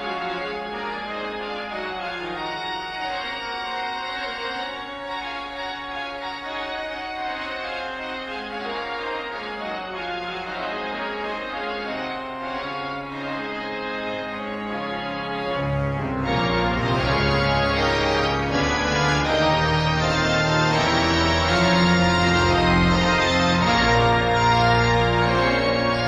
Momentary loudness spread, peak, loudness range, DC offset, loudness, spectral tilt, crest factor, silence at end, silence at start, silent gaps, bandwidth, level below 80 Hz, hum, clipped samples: 11 LU; -6 dBFS; 11 LU; under 0.1%; -23 LUFS; -5 dB/octave; 16 dB; 0 s; 0 s; none; 11 kHz; -38 dBFS; none; under 0.1%